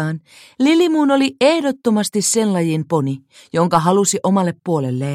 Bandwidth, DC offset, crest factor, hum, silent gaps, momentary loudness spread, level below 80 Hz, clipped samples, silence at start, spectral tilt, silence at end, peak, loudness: 15.5 kHz; under 0.1%; 16 dB; none; none; 8 LU; -60 dBFS; under 0.1%; 0 s; -5 dB/octave; 0 s; 0 dBFS; -17 LUFS